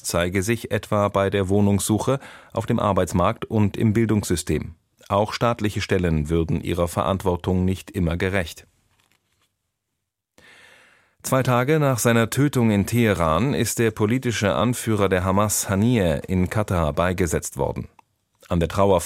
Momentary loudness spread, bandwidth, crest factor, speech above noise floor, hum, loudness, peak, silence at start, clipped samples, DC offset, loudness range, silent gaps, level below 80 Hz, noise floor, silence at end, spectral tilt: 6 LU; 16.5 kHz; 18 dB; 59 dB; none; -22 LUFS; -4 dBFS; 0.05 s; under 0.1%; under 0.1%; 7 LU; none; -42 dBFS; -80 dBFS; 0 s; -5.5 dB/octave